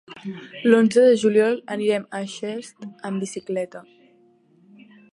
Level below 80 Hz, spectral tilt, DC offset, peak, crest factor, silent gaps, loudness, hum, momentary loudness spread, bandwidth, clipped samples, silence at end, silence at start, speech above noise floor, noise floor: -74 dBFS; -5.5 dB/octave; under 0.1%; -4 dBFS; 20 dB; none; -21 LUFS; none; 19 LU; 11.5 kHz; under 0.1%; 1.35 s; 0.1 s; 36 dB; -57 dBFS